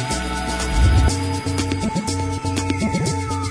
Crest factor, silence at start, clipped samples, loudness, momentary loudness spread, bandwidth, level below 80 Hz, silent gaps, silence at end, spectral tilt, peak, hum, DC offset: 14 dB; 0 s; under 0.1%; -21 LUFS; 6 LU; 11 kHz; -24 dBFS; none; 0 s; -5 dB/octave; -4 dBFS; none; under 0.1%